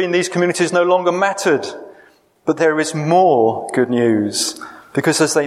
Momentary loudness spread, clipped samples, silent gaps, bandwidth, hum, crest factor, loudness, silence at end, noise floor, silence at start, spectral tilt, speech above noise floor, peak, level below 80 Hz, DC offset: 9 LU; under 0.1%; none; 15 kHz; none; 14 dB; -16 LUFS; 0 s; -50 dBFS; 0 s; -4.5 dB/octave; 34 dB; -2 dBFS; -66 dBFS; under 0.1%